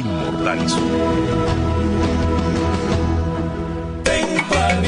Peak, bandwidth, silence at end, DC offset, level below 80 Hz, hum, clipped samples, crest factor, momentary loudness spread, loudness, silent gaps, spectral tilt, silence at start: -4 dBFS; 10.5 kHz; 0 s; under 0.1%; -28 dBFS; none; under 0.1%; 16 dB; 5 LU; -19 LUFS; none; -5.5 dB/octave; 0 s